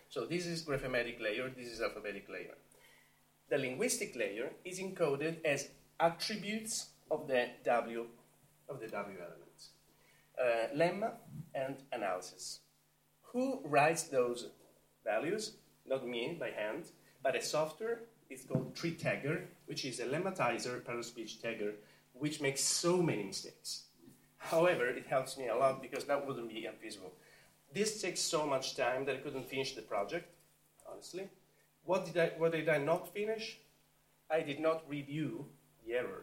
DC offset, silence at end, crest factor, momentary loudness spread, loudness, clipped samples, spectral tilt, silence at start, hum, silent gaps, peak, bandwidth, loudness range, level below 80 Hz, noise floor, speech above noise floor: under 0.1%; 0 s; 22 dB; 15 LU; -37 LUFS; under 0.1%; -4 dB/octave; 0.1 s; none; none; -16 dBFS; 16.5 kHz; 4 LU; -72 dBFS; -73 dBFS; 36 dB